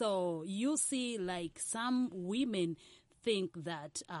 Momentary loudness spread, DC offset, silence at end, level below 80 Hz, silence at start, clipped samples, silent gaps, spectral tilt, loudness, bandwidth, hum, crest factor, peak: 9 LU; under 0.1%; 0 s; -74 dBFS; 0 s; under 0.1%; none; -4 dB/octave; -37 LUFS; 11.5 kHz; none; 16 dB; -22 dBFS